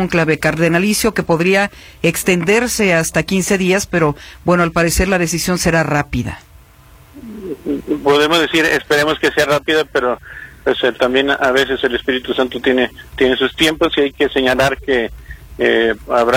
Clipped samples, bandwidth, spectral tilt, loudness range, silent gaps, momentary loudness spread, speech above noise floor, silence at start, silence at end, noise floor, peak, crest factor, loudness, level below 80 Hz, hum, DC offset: under 0.1%; 17.5 kHz; -4 dB/octave; 2 LU; none; 8 LU; 29 dB; 0 s; 0 s; -43 dBFS; 0 dBFS; 16 dB; -15 LUFS; -36 dBFS; none; under 0.1%